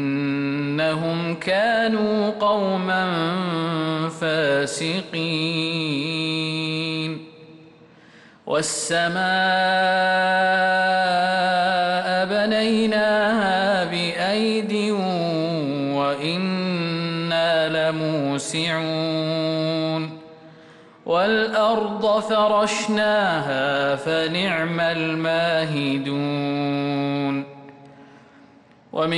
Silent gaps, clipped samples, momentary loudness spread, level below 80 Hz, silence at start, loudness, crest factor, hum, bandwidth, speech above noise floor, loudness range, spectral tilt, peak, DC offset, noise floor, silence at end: none; under 0.1%; 6 LU; -64 dBFS; 0 s; -21 LUFS; 12 dB; none; 11.5 kHz; 30 dB; 5 LU; -4.5 dB/octave; -10 dBFS; under 0.1%; -51 dBFS; 0 s